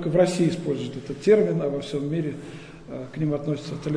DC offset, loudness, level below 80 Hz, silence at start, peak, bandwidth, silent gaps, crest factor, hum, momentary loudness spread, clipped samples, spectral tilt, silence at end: under 0.1%; -24 LUFS; -56 dBFS; 0 s; -6 dBFS; 10.5 kHz; none; 18 dB; none; 18 LU; under 0.1%; -7 dB/octave; 0 s